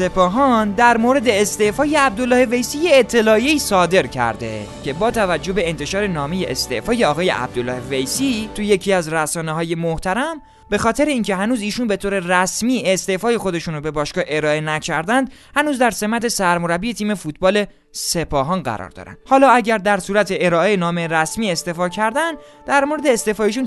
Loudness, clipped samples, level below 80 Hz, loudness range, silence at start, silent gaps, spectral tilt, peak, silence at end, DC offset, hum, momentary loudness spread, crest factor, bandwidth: -18 LUFS; under 0.1%; -42 dBFS; 5 LU; 0 s; none; -4 dB/octave; 0 dBFS; 0 s; under 0.1%; none; 8 LU; 18 dB; 12.5 kHz